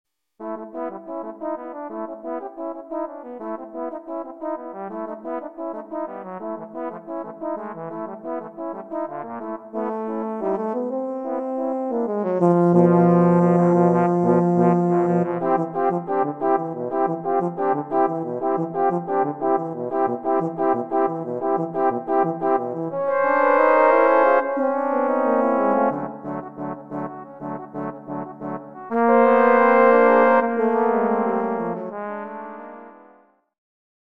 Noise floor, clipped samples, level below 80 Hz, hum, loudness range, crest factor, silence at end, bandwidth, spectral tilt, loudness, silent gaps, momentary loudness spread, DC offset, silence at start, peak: -55 dBFS; under 0.1%; -70 dBFS; none; 14 LU; 18 dB; 1.15 s; 4.4 kHz; -10 dB/octave; -21 LUFS; none; 17 LU; 0.1%; 0.4 s; -2 dBFS